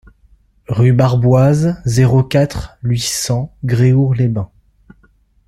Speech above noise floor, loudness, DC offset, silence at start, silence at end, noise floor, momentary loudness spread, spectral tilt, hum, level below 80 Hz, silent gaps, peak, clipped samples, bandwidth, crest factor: 40 dB; -14 LUFS; under 0.1%; 0.7 s; 1 s; -53 dBFS; 8 LU; -6.5 dB/octave; none; -38 dBFS; none; -2 dBFS; under 0.1%; 13.5 kHz; 12 dB